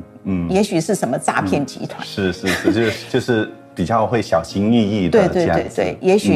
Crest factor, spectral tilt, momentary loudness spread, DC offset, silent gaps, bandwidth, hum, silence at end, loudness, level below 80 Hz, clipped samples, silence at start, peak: 16 dB; -5.5 dB/octave; 8 LU; under 0.1%; none; 14.5 kHz; none; 0 s; -18 LUFS; -46 dBFS; under 0.1%; 0 s; -2 dBFS